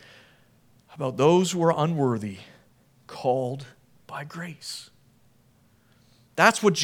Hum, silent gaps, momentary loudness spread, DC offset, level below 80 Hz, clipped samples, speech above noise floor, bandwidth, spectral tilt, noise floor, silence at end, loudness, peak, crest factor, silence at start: none; none; 19 LU; under 0.1%; -72 dBFS; under 0.1%; 37 dB; 18 kHz; -5 dB/octave; -61 dBFS; 0 s; -24 LUFS; -2 dBFS; 24 dB; 0.9 s